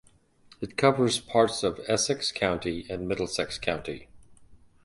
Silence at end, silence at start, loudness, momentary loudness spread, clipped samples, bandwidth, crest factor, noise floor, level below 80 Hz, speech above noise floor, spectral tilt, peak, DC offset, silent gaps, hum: 0.3 s; 0.6 s; -27 LUFS; 11 LU; under 0.1%; 11.5 kHz; 22 dB; -58 dBFS; -54 dBFS; 31 dB; -4 dB/octave; -6 dBFS; under 0.1%; none; none